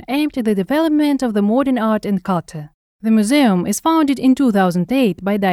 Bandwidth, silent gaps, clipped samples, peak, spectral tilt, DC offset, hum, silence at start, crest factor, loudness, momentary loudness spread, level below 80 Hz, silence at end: 15.5 kHz; 2.74-2.99 s; under 0.1%; -2 dBFS; -6 dB/octave; under 0.1%; none; 0.1 s; 12 dB; -16 LUFS; 6 LU; -52 dBFS; 0 s